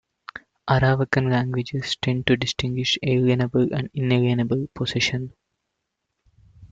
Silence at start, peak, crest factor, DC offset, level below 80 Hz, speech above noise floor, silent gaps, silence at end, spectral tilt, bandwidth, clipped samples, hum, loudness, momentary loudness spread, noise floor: 0.35 s; -2 dBFS; 20 dB; under 0.1%; -50 dBFS; 57 dB; none; 0.05 s; -6 dB/octave; 7.8 kHz; under 0.1%; none; -22 LUFS; 10 LU; -79 dBFS